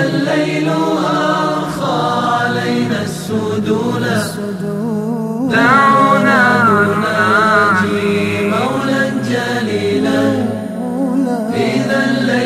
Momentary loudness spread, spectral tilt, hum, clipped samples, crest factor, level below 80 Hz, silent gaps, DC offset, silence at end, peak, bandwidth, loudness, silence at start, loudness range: 9 LU; -5.5 dB/octave; none; under 0.1%; 14 dB; -50 dBFS; none; under 0.1%; 0 s; 0 dBFS; 15 kHz; -14 LUFS; 0 s; 6 LU